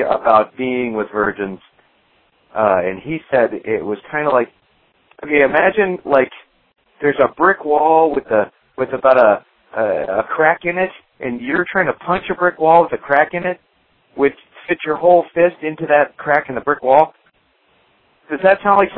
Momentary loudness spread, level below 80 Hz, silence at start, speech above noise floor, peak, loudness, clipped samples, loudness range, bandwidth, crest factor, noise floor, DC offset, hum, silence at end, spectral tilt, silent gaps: 12 LU; -54 dBFS; 0 s; 43 dB; 0 dBFS; -16 LUFS; under 0.1%; 4 LU; 5.2 kHz; 16 dB; -59 dBFS; under 0.1%; none; 0 s; -9 dB/octave; none